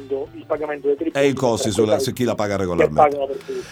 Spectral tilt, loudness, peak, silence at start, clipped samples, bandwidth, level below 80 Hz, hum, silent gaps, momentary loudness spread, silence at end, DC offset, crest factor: -5 dB/octave; -20 LUFS; -2 dBFS; 0 s; under 0.1%; 17.5 kHz; -50 dBFS; none; none; 10 LU; 0 s; under 0.1%; 18 dB